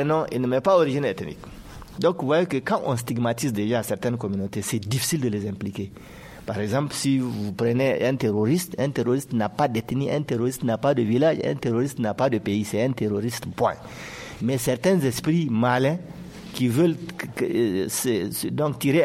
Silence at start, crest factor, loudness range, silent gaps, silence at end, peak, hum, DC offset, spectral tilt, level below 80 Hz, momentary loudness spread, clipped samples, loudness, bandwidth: 0 s; 16 dB; 3 LU; none; 0 s; -8 dBFS; none; under 0.1%; -6 dB/octave; -54 dBFS; 12 LU; under 0.1%; -24 LUFS; 16 kHz